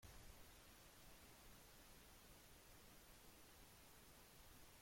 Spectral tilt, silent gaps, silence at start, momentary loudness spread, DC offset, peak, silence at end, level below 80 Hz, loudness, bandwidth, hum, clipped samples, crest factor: -3 dB/octave; none; 0 s; 1 LU; under 0.1%; -50 dBFS; 0 s; -72 dBFS; -65 LUFS; 16.5 kHz; none; under 0.1%; 16 dB